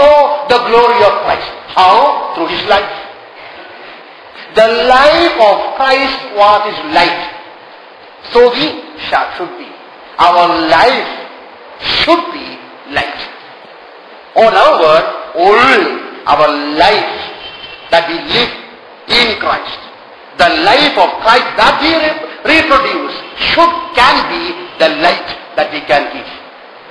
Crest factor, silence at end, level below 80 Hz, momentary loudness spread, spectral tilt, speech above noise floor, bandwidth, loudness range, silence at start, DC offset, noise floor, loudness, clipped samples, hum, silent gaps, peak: 12 dB; 0 s; -42 dBFS; 19 LU; -3.5 dB/octave; 25 dB; 11 kHz; 4 LU; 0 s; under 0.1%; -35 dBFS; -10 LUFS; 0.9%; none; none; 0 dBFS